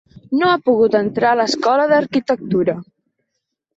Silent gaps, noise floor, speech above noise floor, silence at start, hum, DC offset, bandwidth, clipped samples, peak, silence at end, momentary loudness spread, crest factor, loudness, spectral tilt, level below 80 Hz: none; -76 dBFS; 60 dB; 0.3 s; none; under 0.1%; 8.2 kHz; under 0.1%; -2 dBFS; 0.95 s; 6 LU; 14 dB; -16 LUFS; -5.5 dB/octave; -58 dBFS